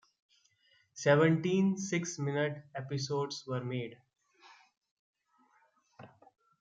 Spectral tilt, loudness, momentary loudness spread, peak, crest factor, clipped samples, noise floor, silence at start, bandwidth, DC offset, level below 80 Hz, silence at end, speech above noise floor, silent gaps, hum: -5.5 dB/octave; -32 LUFS; 14 LU; -12 dBFS; 22 dB; under 0.1%; -71 dBFS; 0.95 s; 9 kHz; under 0.1%; -78 dBFS; 0.55 s; 39 dB; 4.77-4.81 s, 4.91-5.14 s; none